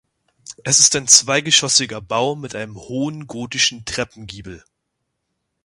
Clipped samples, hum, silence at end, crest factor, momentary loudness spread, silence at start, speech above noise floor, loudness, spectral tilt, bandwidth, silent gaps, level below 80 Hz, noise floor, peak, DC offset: under 0.1%; none; 1.05 s; 20 dB; 19 LU; 0.5 s; 57 dB; -15 LUFS; -1 dB/octave; 16 kHz; none; -52 dBFS; -75 dBFS; 0 dBFS; under 0.1%